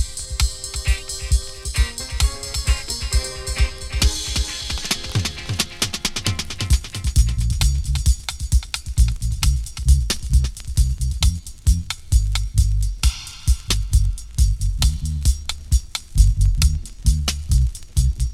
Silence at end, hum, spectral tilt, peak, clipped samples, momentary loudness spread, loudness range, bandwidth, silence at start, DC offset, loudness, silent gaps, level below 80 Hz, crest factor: 0 s; none; -3.5 dB/octave; -2 dBFS; under 0.1%; 5 LU; 2 LU; 15 kHz; 0 s; under 0.1%; -22 LUFS; none; -20 dBFS; 18 dB